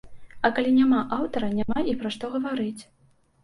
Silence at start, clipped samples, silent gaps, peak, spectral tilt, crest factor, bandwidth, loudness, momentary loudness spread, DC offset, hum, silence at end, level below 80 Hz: 0.05 s; under 0.1%; none; -8 dBFS; -6 dB/octave; 18 dB; 11.5 kHz; -25 LUFS; 10 LU; under 0.1%; none; 0.6 s; -52 dBFS